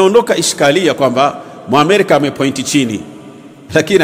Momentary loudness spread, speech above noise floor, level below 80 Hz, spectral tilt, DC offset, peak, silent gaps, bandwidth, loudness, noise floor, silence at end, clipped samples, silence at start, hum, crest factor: 8 LU; 23 dB; -52 dBFS; -4 dB/octave; under 0.1%; 0 dBFS; none; 16.5 kHz; -12 LUFS; -35 dBFS; 0 s; 0.5%; 0 s; none; 12 dB